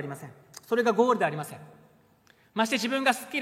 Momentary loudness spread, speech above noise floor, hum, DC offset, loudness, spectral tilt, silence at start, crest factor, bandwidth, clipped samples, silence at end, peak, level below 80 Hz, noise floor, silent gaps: 21 LU; 34 dB; none; under 0.1%; -26 LUFS; -4 dB/octave; 0 s; 20 dB; 16 kHz; under 0.1%; 0 s; -8 dBFS; -78 dBFS; -62 dBFS; none